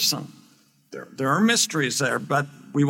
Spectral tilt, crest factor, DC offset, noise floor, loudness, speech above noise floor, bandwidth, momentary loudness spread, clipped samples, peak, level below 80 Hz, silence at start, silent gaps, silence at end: -3.5 dB/octave; 18 dB; under 0.1%; -58 dBFS; -22 LUFS; 34 dB; 17 kHz; 21 LU; under 0.1%; -6 dBFS; -76 dBFS; 0 s; none; 0 s